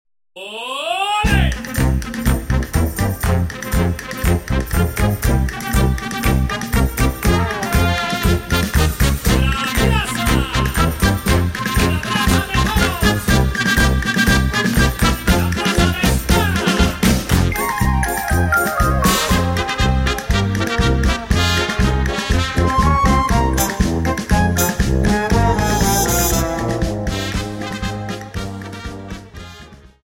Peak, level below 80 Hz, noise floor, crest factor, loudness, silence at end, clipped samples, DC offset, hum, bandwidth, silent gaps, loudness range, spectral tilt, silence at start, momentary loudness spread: -2 dBFS; -22 dBFS; -40 dBFS; 14 dB; -17 LUFS; 0.3 s; under 0.1%; under 0.1%; none; 16.5 kHz; none; 3 LU; -4.5 dB/octave; 0.35 s; 7 LU